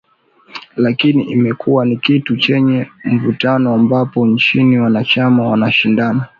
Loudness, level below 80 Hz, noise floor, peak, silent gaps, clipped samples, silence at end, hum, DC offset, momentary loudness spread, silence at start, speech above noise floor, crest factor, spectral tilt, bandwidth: -13 LUFS; -56 dBFS; -49 dBFS; -2 dBFS; none; under 0.1%; 0.15 s; none; under 0.1%; 5 LU; 0.55 s; 36 dB; 12 dB; -8 dB/octave; 6.6 kHz